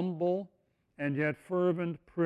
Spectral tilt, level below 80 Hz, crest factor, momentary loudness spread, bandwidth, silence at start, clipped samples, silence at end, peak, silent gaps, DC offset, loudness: -9 dB/octave; -72 dBFS; 14 dB; 7 LU; 10.5 kHz; 0 s; under 0.1%; 0 s; -18 dBFS; none; under 0.1%; -33 LUFS